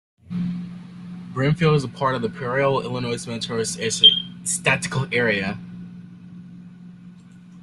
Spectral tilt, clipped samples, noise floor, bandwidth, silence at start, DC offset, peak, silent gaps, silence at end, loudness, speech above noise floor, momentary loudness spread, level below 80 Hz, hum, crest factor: -3.5 dB/octave; under 0.1%; -44 dBFS; 12.5 kHz; 0.3 s; under 0.1%; -2 dBFS; none; 0 s; -20 LUFS; 23 dB; 26 LU; -56 dBFS; none; 22 dB